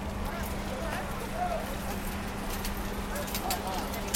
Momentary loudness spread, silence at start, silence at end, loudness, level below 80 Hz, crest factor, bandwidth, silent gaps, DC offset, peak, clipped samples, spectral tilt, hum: 4 LU; 0 s; 0 s; -34 LUFS; -40 dBFS; 22 dB; 17 kHz; none; under 0.1%; -12 dBFS; under 0.1%; -4.5 dB/octave; none